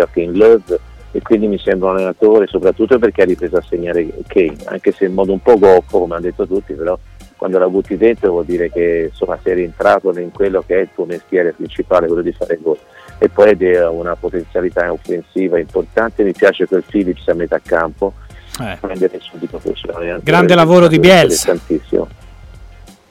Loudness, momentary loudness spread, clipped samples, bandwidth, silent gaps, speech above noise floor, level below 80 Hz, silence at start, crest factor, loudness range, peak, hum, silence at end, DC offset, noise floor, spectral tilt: -14 LUFS; 12 LU; under 0.1%; 16 kHz; none; 25 dB; -38 dBFS; 0 s; 14 dB; 5 LU; 0 dBFS; none; 0.45 s; under 0.1%; -38 dBFS; -5.5 dB/octave